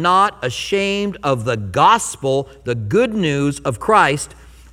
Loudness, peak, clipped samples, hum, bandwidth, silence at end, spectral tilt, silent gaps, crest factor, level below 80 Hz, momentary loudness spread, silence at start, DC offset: -17 LUFS; 0 dBFS; under 0.1%; none; 16.5 kHz; 0.25 s; -4.5 dB/octave; none; 18 dB; -46 dBFS; 10 LU; 0 s; under 0.1%